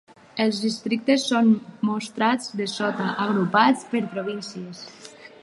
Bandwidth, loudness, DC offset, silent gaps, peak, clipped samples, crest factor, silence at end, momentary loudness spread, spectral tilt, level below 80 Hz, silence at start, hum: 11.5 kHz; -23 LUFS; under 0.1%; none; -4 dBFS; under 0.1%; 20 dB; 0.15 s; 17 LU; -5 dB/octave; -72 dBFS; 0.35 s; none